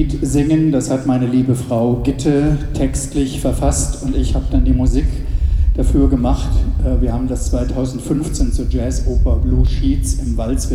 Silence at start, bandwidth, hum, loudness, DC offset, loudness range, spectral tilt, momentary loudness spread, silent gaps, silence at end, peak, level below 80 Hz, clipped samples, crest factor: 0 s; 13.5 kHz; none; -17 LUFS; under 0.1%; 2 LU; -7 dB/octave; 5 LU; none; 0 s; -2 dBFS; -18 dBFS; under 0.1%; 12 dB